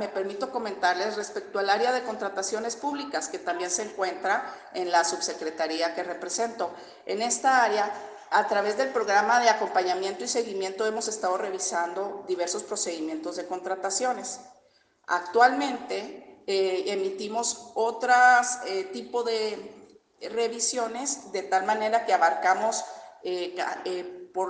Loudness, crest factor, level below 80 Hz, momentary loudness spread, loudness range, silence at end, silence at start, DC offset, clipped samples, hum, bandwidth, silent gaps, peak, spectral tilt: -27 LUFS; 22 dB; -76 dBFS; 12 LU; 5 LU; 0 s; 0 s; under 0.1%; under 0.1%; none; 10 kHz; none; -6 dBFS; -1.5 dB/octave